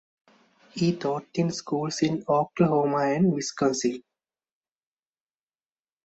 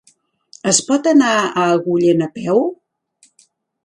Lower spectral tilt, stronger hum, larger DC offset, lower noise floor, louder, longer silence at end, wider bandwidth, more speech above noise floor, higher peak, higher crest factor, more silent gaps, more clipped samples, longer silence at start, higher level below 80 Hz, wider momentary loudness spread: first, -5.5 dB/octave vs -4 dB/octave; neither; neither; first, under -90 dBFS vs -57 dBFS; second, -26 LUFS vs -15 LUFS; first, 2.05 s vs 1.1 s; second, 8.2 kHz vs 11.5 kHz; first, over 65 dB vs 43 dB; second, -8 dBFS vs 0 dBFS; about the same, 20 dB vs 18 dB; neither; neither; about the same, 0.75 s vs 0.65 s; about the same, -66 dBFS vs -64 dBFS; about the same, 7 LU vs 6 LU